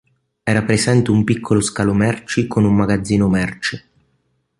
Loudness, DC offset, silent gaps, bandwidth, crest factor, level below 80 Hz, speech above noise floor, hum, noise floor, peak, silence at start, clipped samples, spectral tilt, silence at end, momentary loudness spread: -17 LUFS; under 0.1%; none; 11.5 kHz; 16 dB; -42 dBFS; 49 dB; none; -65 dBFS; -2 dBFS; 0.45 s; under 0.1%; -6 dB/octave; 0.8 s; 8 LU